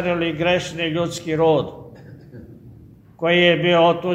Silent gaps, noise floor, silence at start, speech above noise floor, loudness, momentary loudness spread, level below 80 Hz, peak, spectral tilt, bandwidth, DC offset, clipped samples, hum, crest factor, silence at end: none; -45 dBFS; 0 s; 27 dB; -18 LUFS; 10 LU; -52 dBFS; -2 dBFS; -5.5 dB/octave; 13 kHz; under 0.1%; under 0.1%; none; 18 dB; 0 s